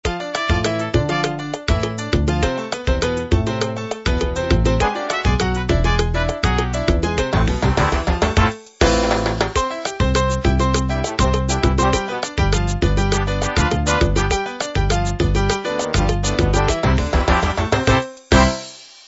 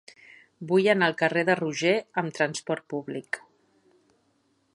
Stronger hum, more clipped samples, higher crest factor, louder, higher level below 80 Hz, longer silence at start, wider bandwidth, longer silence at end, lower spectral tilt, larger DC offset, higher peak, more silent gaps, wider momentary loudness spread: neither; neither; about the same, 18 dB vs 20 dB; first, -19 LUFS vs -26 LUFS; first, -24 dBFS vs -76 dBFS; second, 0.05 s vs 0.6 s; second, 8 kHz vs 11.5 kHz; second, 0.2 s vs 1.35 s; about the same, -5 dB/octave vs -5 dB/octave; neither; first, 0 dBFS vs -6 dBFS; neither; second, 5 LU vs 12 LU